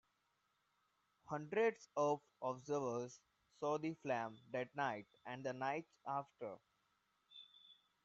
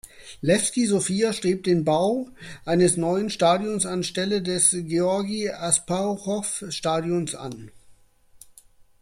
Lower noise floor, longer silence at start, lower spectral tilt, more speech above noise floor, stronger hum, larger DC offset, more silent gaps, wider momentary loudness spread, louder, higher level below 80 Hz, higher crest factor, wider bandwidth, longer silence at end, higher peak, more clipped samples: first, -83 dBFS vs -54 dBFS; first, 1.3 s vs 0.05 s; about the same, -4.5 dB/octave vs -4 dB/octave; first, 40 dB vs 31 dB; neither; neither; neither; first, 20 LU vs 10 LU; second, -43 LUFS vs -23 LUFS; second, -88 dBFS vs -58 dBFS; about the same, 20 dB vs 18 dB; second, 7.6 kHz vs 15 kHz; second, 0.3 s vs 1.1 s; second, -24 dBFS vs -6 dBFS; neither